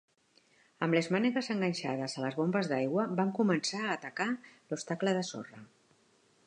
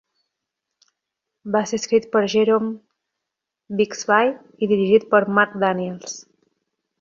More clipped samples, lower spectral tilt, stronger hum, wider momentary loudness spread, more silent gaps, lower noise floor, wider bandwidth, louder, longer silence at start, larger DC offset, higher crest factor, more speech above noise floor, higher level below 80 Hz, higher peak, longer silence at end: neither; about the same, -5.5 dB/octave vs -4.5 dB/octave; neither; second, 11 LU vs 15 LU; neither; second, -68 dBFS vs -83 dBFS; first, 10.5 kHz vs 7.6 kHz; second, -32 LUFS vs -20 LUFS; second, 0.8 s vs 1.45 s; neither; about the same, 20 dB vs 20 dB; second, 36 dB vs 64 dB; second, -82 dBFS vs -66 dBFS; second, -14 dBFS vs -2 dBFS; about the same, 0.8 s vs 0.8 s